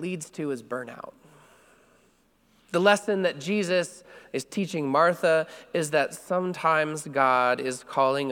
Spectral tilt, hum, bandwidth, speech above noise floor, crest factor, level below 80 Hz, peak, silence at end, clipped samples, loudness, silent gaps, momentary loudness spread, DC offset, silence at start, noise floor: -4.5 dB/octave; none; 17.5 kHz; 38 dB; 22 dB; -72 dBFS; -4 dBFS; 0 s; under 0.1%; -26 LUFS; none; 13 LU; under 0.1%; 0 s; -64 dBFS